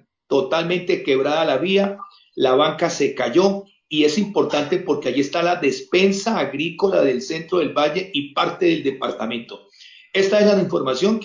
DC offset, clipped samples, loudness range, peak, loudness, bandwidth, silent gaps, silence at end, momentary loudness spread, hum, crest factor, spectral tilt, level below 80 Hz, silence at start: under 0.1%; under 0.1%; 2 LU; -4 dBFS; -20 LUFS; 7.8 kHz; none; 0 s; 8 LU; none; 16 dB; -5 dB/octave; -64 dBFS; 0.3 s